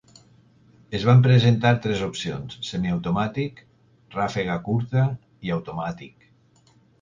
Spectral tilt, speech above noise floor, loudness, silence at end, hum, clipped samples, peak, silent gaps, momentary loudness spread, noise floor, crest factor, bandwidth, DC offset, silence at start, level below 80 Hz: -7 dB/octave; 37 dB; -23 LUFS; 0.95 s; none; under 0.1%; -4 dBFS; none; 15 LU; -58 dBFS; 20 dB; 7.6 kHz; under 0.1%; 0.9 s; -52 dBFS